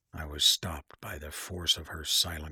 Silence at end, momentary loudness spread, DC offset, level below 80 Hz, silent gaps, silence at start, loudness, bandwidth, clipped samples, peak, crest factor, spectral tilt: 0 s; 17 LU; under 0.1%; -48 dBFS; none; 0.15 s; -27 LUFS; 19.5 kHz; under 0.1%; -10 dBFS; 22 dB; -1 dB/octave